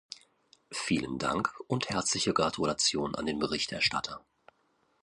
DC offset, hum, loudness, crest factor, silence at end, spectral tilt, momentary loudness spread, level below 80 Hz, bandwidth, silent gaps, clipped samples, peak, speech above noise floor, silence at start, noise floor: under 0.1%; none; -30 LUFS; 22 dB; 0.85 s; -3 dB/octave; 13 LU; -60 dBFS; 11.5 kHz; none; under 0.1%; -12 dBFS; 41 dB; 0.1 s; -72 dBFS